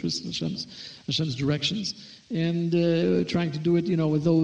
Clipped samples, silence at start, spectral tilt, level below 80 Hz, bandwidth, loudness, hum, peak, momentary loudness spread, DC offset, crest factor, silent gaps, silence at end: under 0.1%; 0 s; -6 dB/octave; -60 dBFS; 8.6 kHz; -26 LUFS; none; -12 dBFS; 11 LU; under 0.1%; 14 dB; none; 0 s